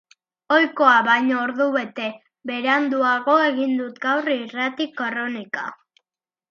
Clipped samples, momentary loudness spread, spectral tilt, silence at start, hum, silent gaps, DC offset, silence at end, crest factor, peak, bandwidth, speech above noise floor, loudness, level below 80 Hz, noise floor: under 0.1%; 14 LU; -4.5 dB/octave; 0.5 s; none; none; under 0.1%; 0.75 s; 18 dB; -2 dBFS; 7 kHz; 66 dB; -20 LUFS; -78 dBFS; -87 dBFS